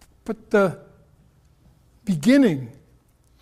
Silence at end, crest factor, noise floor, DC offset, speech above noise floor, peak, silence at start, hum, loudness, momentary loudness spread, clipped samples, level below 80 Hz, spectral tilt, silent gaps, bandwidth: 0.7 s; 18 dB; -58 dBFS; under 0.1%; 38 dB; -6 dBFS; 0.25 s; none; -20 LUFS; 20 LU; under 0.1%; -56 dBFS; -6.5 dB/octave; none; 13.5 kHz